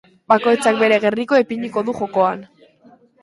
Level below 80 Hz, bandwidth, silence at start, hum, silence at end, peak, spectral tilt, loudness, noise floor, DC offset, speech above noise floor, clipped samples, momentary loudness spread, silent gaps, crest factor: -62 dBFS; 11.5 kHz; 0.3 s; none; 0.75 s; 0 dBFS; -5 dB/octave; -17 LUFS; -50 dBFS; under 0.1%; 34 dB; under 0.1%; 7 LU; none; 18 dB